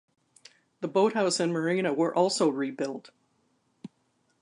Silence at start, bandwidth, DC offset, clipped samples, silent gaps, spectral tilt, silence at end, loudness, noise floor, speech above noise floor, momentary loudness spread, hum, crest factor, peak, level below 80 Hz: 0.8 s; 11 kHz; under 0.1%; under 0.1%; none; -4.5 dB/octave; 0.55 s; -27 LUFS; -72 dBFS; 45 dB; 10 LU; none; 18 dB; -12 dBFS; -82 dBFS